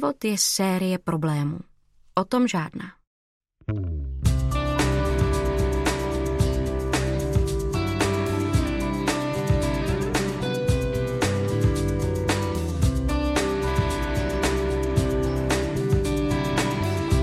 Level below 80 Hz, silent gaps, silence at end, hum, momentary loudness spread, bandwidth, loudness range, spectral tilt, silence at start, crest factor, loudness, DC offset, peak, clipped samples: -30 dBFS; 3.07-3.41 s; 0 s; none; 3 LU; 15 kHz; 2 LU; -5.5 dB/octave; 0 s; 18 dB; -24 LUFS; under 0.1%; -6 dBFS; under 0.1%